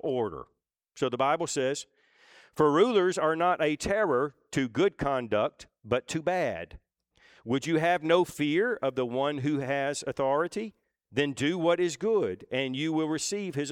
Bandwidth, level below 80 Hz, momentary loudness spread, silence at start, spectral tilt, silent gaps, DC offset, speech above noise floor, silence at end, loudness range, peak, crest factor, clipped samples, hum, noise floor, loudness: 16 kHz; -60 dBFS; 8 LU; 0.05 s; -5 dB/octave; none; under 0.1%; 36 dB; 0 s; 3 LU; -10 dBFS; 18 dB; under 0.1%; none; -64 dBFS; -28 LUFS